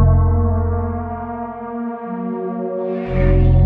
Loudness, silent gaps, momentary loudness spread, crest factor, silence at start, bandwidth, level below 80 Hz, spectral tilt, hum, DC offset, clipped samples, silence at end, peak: -20 LUFS; none; 11 LU; 14 dB; 0 s; 3.7 kHz; -22 dBFS; -12 dB/octave; none; under 0.1%; under 0.1%; 0 s; -2 dBFS